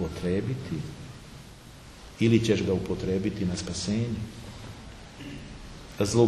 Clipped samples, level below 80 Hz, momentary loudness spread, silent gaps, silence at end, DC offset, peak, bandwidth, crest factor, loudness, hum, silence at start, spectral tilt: under 0.1%; -48 dBFS; 22 LU; none; 0 s; under 0.1%; -8 dBFS; 13 kHz; 20 dB; -28 LUFS; none; 0 s; -6 dB/octave